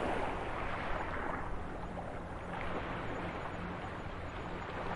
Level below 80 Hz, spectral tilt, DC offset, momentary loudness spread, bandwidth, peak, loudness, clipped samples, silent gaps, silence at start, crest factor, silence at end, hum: -48 dBFS; -6.5 dB/octave; under 0.1%; 5 LU; 11.5 kHz; -24 dBFS; -41 LUFS; under 0.1%; none; 0 s; 16 dB; 0 s; none